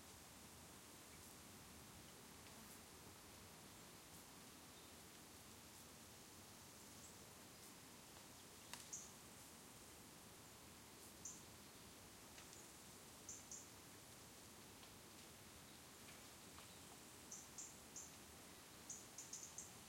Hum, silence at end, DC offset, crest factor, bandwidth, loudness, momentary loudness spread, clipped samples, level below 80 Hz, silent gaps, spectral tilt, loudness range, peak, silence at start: none; 0 s; under 0.1%; 26 dB; 16.5 kHz; -58 LUFS; 6 LU; under 0.1%; -78 dBFS; none; -2 dB/octave; 3 LU; -34 dBFS; 0 s